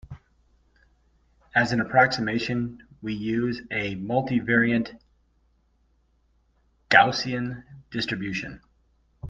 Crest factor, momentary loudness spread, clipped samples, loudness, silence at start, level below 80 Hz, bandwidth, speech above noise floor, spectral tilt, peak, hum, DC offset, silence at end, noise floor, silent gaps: 26 dB; 16 LU; under 0.1%; -24 LUFS; 0.05 s; -56 dBFS; 7.6 kHz; 42 dB; -5.5 dB/octave; 0 dBFS; none; under 0.1%; 0 s; -66 dBFS; none